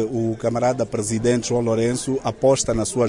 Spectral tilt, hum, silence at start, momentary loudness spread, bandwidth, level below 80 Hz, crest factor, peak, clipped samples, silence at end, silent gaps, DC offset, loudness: -5 dB/octave; none; 0 s; 5 LU; 11 kHz; -44 dBFS; 14 dB; -6 dBFS; under 0.1%; 0 s; none; under 0.1%; -21 LUFS